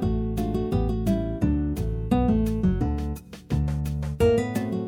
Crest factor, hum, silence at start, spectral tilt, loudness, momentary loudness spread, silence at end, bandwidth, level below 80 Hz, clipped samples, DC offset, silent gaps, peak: 16 dB; none; 0 s; -8.5 dB/octave; -25 LUFS; 7 LU; 0 s; 18 kHz; -32 dBFS; under 0.1%; under 0.1%; none; -8 dBFS